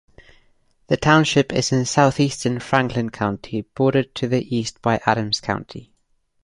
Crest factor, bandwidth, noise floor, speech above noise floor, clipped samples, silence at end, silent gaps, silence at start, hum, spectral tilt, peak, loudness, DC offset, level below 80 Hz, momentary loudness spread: 20 dB; 11.5 kHz; -64 dBFS; 44 dB; under 0.1%; 0.6 s; none; 0.9 s; none; -5 dB/octave; -2 dBFS; -20 LUFS; under 0.1%; -50 dBFS; 11 LU